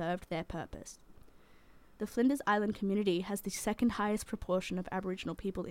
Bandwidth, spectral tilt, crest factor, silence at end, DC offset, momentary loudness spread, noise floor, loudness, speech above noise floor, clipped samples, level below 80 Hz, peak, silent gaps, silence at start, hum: 16.5 kHz; -5 dB/octave; 18 dB; 0 s; under 0.1%; 12 LU; -59 dBFS; -35 LUFS; 24 dB; under 0.1%; -56 dBFS; -18 dBFS; none; 0 s; none